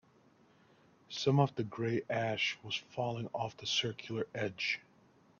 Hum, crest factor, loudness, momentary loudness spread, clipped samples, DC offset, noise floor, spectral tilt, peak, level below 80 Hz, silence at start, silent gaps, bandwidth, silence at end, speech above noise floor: none; 22 dB; -35 LUFS; 9 LU; under 0.1%; under 0.1%; -66 dBFS; -5 dB/octave; -16 dBFS; -74 dBFS; 1.1 s; none; 7.2 kHz; 0.6 s; 31 dB